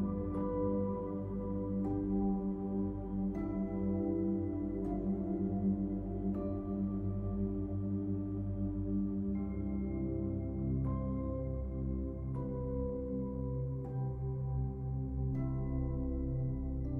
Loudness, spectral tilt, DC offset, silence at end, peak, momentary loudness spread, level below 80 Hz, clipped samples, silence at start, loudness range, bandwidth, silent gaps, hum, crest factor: -37 LUFS; -13 dB/octave; under 0.1%; 0 s; -24 dBFS; 4 LU; -44 dBFS; under 0.1%; 0 s; 2 LU; 2.5 kHz; none; none; 12 dB